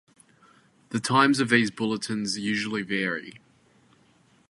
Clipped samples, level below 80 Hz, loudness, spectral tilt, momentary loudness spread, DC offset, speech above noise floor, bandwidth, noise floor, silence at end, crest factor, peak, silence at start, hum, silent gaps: under 0.1%; -68 dBFS; -25 LUFS; -4 dB/octave; 12 LU; under 0.1%; 36 dB; 11.5 kHz; -61 dBFS; 1.1 s; 24 dB; -4 dBFS; 0.9 s; none; none